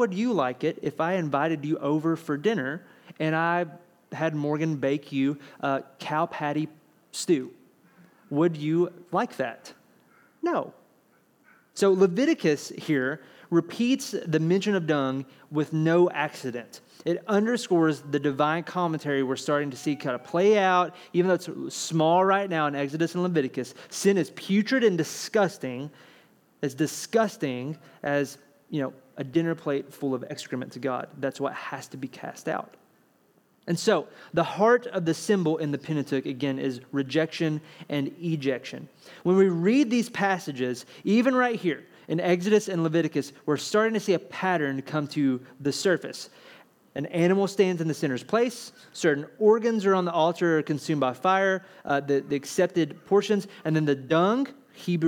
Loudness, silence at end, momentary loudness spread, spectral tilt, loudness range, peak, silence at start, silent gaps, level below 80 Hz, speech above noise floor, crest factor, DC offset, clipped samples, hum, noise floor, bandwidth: -26 LUFS; 0 s; 12 LU; -5.5 dB/octave; 6 LU; -8 dBFS; 0 s; none; -78 dBFS; 38 dB; 18 dB; under 0.1%; under 0.1%; none; -64 dBFS; 17.5 kHz